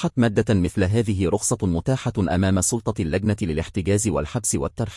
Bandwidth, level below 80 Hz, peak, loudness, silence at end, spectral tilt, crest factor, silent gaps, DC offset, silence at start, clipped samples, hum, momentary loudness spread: 12 kHz; -42 dBFS; -6 dBFS; -22 LUFS; 0 s; -5.5 dB/octave; 14 dB; none; under 0.1%; 0 s; under 0.1%; none; 5 LU